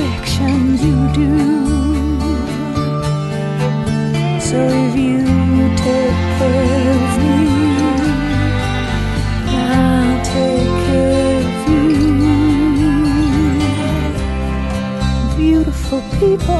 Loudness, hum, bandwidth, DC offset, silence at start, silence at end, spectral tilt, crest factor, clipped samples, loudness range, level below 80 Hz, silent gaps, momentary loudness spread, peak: -15 LUFS; none; 12.5 kHz; under 0.1%; 0 s; 0 s; -6.5 dB/octave; 12 dB; under 0.1%; 3 LU; -22 dBFS; none; 6 LU; 0 dBFS